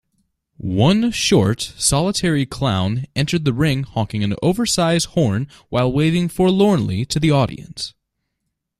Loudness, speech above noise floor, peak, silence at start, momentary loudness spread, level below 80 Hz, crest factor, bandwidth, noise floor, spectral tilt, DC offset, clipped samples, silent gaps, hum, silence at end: -18 LUFS; 59 dB; -2 dBFS; 0.6 s; 8 LU; -42 dBFS; 16 dB; 14.5 kHz; -76 dBFS; -5 dB/octave; under 0.1%; under 0.1%; none; none; 0.9 s